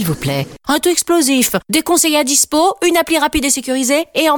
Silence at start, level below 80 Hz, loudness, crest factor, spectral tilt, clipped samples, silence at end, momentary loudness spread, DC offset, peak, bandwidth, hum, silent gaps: 0 s; -42 dBFS; -14 LUFS; 12 dB; -3 dB/octave; under 0.1%; 0 s; 6 LU; 0.1%; -2 dBFS; 19.5 kHz; none; none